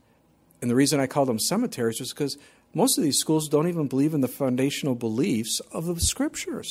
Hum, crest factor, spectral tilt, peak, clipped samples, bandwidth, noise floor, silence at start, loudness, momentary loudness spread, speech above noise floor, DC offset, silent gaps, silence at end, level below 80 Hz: none; 16 dB; -4.5 dB/octave; -8 dBFS; under 0.1%; 16.5 kHz; -61 dBFS; 0.6 s; -25 LUFS; 9 LU; 37 dB; under 0.1%; none; 0 s; -48 dBFS